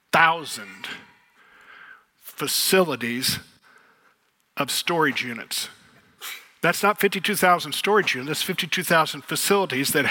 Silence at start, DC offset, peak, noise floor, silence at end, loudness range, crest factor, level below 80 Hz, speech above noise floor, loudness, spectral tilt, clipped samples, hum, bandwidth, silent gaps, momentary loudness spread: 0.15 s; under 0.1%; -2 dBFS; -65 dBFS; 0 s; 5 LU; 22 dB; -68 dBFS; 42 dB; -22 LUFS; -2.5 dB/octave; under 0.1%; none; 18 kHz; none; 17 LU